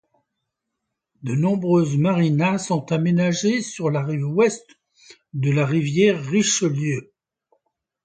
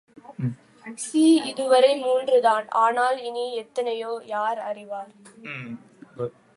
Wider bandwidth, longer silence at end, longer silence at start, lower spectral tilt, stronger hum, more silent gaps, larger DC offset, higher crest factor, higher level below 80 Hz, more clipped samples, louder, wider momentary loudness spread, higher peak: second, 9.4 kHz vs 11.5 kHz; first, 1 s vs 0.25 s; first, 1.25 s vs 0.3 s; about the same, -5.5 dB/octave vs -5 dB/octave; neither; neither; neither; about the same, 16 dB vs 18 dB; first, -62 dBFS vs -74 dBFS; neither; about the same, -21 LUFS vs -23 LUFS; second, 8 LU vs 21 LU; about the same, -4 dBFS vs -6 dBFS